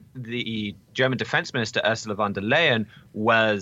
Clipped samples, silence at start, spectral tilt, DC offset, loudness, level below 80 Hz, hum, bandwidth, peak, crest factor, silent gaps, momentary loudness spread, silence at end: under 0.1%; 0.15 s; -4.5 dB/octave; under 0.1%; -24 LUFS; -64 dBFS; none; 8.2 kHz; -8 dBFS; 18 dB; none; 11 LU; 0 s